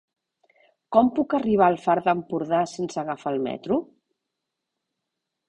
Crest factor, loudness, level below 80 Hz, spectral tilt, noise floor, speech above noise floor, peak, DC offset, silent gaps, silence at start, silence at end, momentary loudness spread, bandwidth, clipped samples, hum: 22 dB; -24 LUFS; -62 dBFS; -6.5 dB/octave; -83 dBFS; 60 dB; -4 dBFS; under 0.1%; none; 0.9 s; 1.65 s; 8 LU; 9.8 kHz; under 0.1%; none